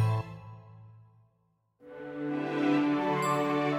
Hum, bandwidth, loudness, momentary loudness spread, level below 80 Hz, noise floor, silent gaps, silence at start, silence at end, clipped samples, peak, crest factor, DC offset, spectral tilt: none; 16 kHz; -29 LUFS; 22 LU; -66 dBFS; -73 dBFS; none; 0 s; 0 s; under 0.1%; -16 dBFS; 14 dB; under 0.1%; -7 dB/octave